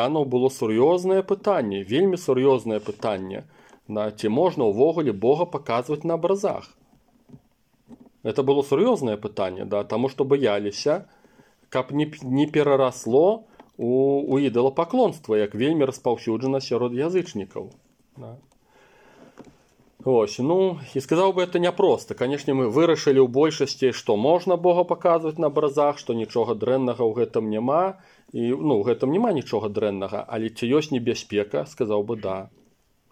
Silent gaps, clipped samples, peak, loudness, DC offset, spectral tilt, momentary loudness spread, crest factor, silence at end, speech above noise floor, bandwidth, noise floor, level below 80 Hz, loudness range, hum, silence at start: none; under 0.1%; -6 dBFS; -23 LUFS; under 0.1%; -6.5 dB/octave; 9 LU; 16 dB; 0.65 s; 42 dB; 13 kHz; -64 dBFS; -68 dBFS; 6 LU; none; 0 s